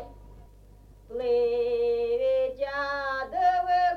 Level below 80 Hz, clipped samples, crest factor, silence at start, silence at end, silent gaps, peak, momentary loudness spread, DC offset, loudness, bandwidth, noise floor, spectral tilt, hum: -52 dBFS; under 0.1%; 12 dB; 0 s; 0 s; none; -14 dBFS; 7 LU; under 0.1%; -27 LUFS; 6.4 kHz; -52 dBFS; -5 dB/octave; 50 Hz at -55 dBFS